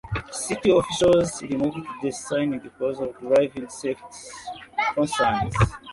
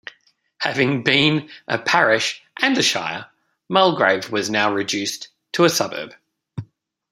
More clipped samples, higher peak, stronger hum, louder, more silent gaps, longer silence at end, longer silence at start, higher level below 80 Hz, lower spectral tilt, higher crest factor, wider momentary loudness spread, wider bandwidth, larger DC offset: neither; second, -6 dBFS vs 0 dBFS; neither; second, -24 LUFS vs -19 LUFS; neither; second, 0 s vs 0.5 s; second, 0.05 s vs 0.6 s; first, -44 dBFS vs -64 dBFS; first, -5 dB/octave vs -3.5 dB/octave; about the same, 16 dB vs 20 dB; second, 12 LU vs 17 LU; second, 11.5 kHz vs 16 kHz; neither